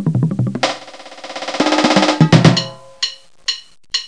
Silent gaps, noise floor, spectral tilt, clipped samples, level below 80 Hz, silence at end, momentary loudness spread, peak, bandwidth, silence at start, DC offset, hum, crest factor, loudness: none; -35 dBFS; -5 dB/octave; 0.1%; -50 dBFS; 0 s; 18 LU; 0 dBFS; 10.5 kHz; 0 s; 0.5%; none; 16 dB; -15 LUFS